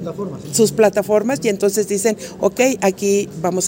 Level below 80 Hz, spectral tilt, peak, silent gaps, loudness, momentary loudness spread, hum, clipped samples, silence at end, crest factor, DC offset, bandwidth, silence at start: -54 dBFS; -4 dB/octave; -2 dBFS; none; -17 LUFS; 7 LU; none; under 0.1%; 0 s; 16 dB; under 0.1%; 16.5 kHz; 0 s